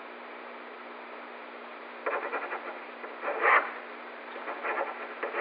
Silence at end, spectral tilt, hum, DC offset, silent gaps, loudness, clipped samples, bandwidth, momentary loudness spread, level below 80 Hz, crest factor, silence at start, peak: 0 s; 2.5 dB/octave; none; under 0.1%; none; -32 LUFS; under 0.1%; 4.9 kHz; 18 LU; under -90 dBFS; 22 dB; 0 s; -12 dBFS